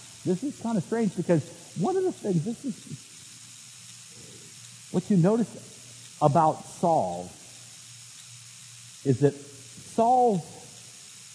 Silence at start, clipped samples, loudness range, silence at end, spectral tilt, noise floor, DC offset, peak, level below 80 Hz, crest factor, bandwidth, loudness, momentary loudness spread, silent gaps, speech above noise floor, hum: 0 s; under 0.1%; 5 LU; 0 s; -6.5 dB/octave; -47 dBFS; under 0.1%; -6 dBFS; -70 dBFS; 22 dB; 11 kHz; -26 LUFS; 21 LU; none; 22 dB; none